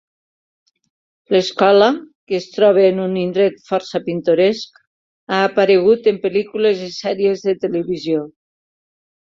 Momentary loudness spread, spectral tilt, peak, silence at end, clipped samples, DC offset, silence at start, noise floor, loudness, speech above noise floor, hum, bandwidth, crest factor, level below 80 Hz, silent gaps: 11 LU; -6 dB/octave; -2 dBFS; 0.95 s; under 0.1%; under 0.1%; 1.3 s; under -90 dBFS; -17 LUFS; over 74 dB; none; 7.4 kHz; 16 dB; -62 dBFS; 2.15-2.27 s, 4.87-5.27 s